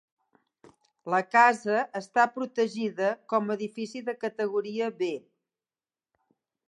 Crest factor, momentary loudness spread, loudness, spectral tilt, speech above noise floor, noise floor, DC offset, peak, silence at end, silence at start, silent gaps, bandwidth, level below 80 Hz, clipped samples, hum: 22 dB; 13 LU; -27 LUFS; -5 dB/octave; over 63 dB; under -90 dBFS; under 0.1%; -8 dBFS; 1.5 s; 1.05 s; none; 11.5 kHz; -84 dBFS; under 0.1%; none